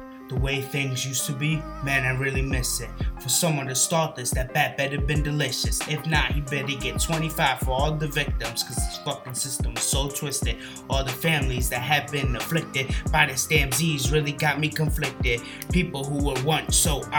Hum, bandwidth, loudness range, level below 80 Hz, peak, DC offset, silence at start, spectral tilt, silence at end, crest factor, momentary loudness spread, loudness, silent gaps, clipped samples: none; over 20 kHz; 3 LU; -32 dBFS; -2 dBFS; under 0.1%; 0 s; -3.5 dB/octave; 0 s; 22 dB; 6 LU; -24 LUFS; none; under 0.1%